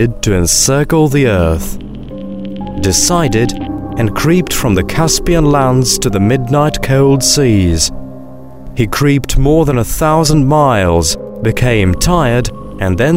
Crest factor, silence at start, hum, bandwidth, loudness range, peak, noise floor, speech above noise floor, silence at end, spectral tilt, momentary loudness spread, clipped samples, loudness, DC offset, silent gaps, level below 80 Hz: 12 dB; 0 s; none; 16.5 kHz; 3 LU; 0 dBFS; -31 dBFS; 21 dB; 0 s; -4.5 dB/octave; 13 LU; under 0.1%; -11 LUFS; 2%; none; -24 dBFS